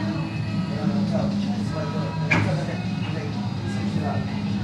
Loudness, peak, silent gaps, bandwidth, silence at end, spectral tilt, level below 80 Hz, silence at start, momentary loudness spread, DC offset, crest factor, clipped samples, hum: -25 LUFS; -6 dBFS; none; 10.5 kHz; 0 s; -7 dB/octave; -50 dBFS; 0 s; 6 LU; under 0.1%; 20 dB; under 0.1%; none